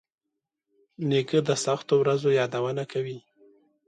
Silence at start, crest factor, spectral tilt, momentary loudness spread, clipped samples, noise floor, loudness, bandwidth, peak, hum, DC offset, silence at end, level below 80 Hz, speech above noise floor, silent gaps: 1 s; 18 dB; -5.5 dB/octave; 10 LU; under 0.1%; -85 dBFS; -26 LUFS; 11 kHz; -10 dBFS; none; under 0.1%; 0.7 s; -72 dBFS; 60 dB; none